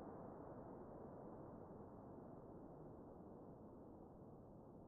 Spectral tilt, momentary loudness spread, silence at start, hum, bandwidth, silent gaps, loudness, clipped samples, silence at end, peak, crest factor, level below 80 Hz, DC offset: -7.5 dB/octave; 5 LU; 0 s; none; 2.1 kHz; none; -59 LUFS; under 0.1%; 0 s; -44 dBFS; 14 dB; -72 dBFS; under 0.1%